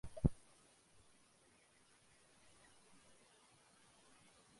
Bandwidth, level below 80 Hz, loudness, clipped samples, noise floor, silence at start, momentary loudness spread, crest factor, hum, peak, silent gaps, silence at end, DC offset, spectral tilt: 11.5 kHz; -56 dBFS; -41 LUFS; under 0.1%; -71 dBFS; 0.05 s; 28 LU; 32 dB; none; -18 dBFS; none; 4.25 s; under 0.1%; -7.5 dB/octave